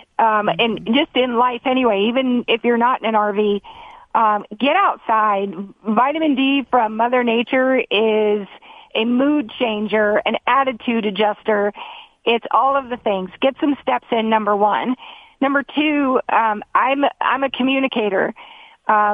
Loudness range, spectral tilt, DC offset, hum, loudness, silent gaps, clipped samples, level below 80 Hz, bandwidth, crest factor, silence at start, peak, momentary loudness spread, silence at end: 2 LU; -7.5 dB/octave; under 0.1%; none; -18 LUFS; none; under 0.1%; -60 dBFS; 4.8 kHz; 16 dB; 0.2 s; -2 dBFS; 6 LU; 0 s